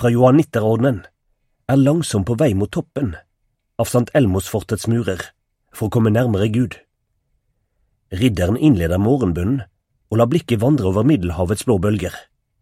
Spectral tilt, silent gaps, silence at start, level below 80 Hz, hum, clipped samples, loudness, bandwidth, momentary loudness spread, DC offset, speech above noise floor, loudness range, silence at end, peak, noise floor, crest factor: -7 dB/octave; none; 0 s; -42 dBFS; none; under 0.1%; -18 LUFS; 16 kHz; 11 LU; under 0.1%; 52 dB; 4 LU; 0.4 s; 0 dBFS; -69 dBFS; 18 dB